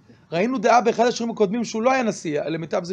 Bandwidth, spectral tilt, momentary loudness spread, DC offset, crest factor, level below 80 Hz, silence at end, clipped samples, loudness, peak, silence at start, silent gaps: 9.8 kHz; -5 dB/octave; 9 LU; under 0.1%; 18 dB; -66 dBFS; 0 s; under 0.1%; -21 LUFS; -4 dBFS; 0.3 s; none